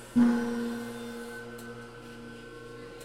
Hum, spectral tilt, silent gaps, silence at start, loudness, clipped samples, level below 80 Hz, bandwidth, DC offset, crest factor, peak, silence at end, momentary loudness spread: none; -5.5 dB/octave; none; 0 s; -31 LUFS; under 0.1%; -58 dBFS; 15 kHz; under 0.1%; 18 dB; -14 dBFS; 0 s; 20 LU